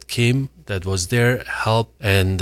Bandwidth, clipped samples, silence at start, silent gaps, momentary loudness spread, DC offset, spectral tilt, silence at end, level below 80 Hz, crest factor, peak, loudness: 15.5 kHz; under 0.1%; 0.1 s; none; 6 LU; under 0.1%; -5 dB/octave; 0 s; -44 dBFS; 18 dB; -2 dBFS; -20 LUFS